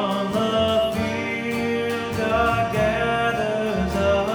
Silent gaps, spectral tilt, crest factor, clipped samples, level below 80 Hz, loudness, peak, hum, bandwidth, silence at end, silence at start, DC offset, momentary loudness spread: none; -5.5 dB/octave; 14 dB; under 0.1%; -40 dBFS; -22 LUFS; -8 dBFS; none; over 20 kHz; 0 s; 0 s; under 0.1%; 4 LU